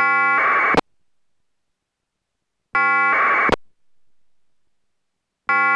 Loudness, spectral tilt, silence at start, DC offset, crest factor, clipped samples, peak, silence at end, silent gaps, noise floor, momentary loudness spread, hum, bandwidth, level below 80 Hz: -17 LUFS; -4.5 dB/octave; 0 s; under 0.1%; 18 dB; under 0.1%; -4 dBFS; 0 s; none; -78 dBFS; 8 LU; none; 11 kHz; -50 dBFS